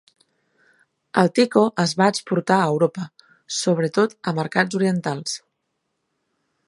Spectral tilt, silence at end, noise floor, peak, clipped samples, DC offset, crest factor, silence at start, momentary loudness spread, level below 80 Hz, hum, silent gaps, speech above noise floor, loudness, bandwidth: -5 dB/octave; 1.3 s; -75 dBFS; -2 dBFS; under 0.1%; under 0.1%; 22 dB; 1.15 s; 10 LU; -70 dBFS; none; none; 55 dB; -21 LUFS; 11.5 kHz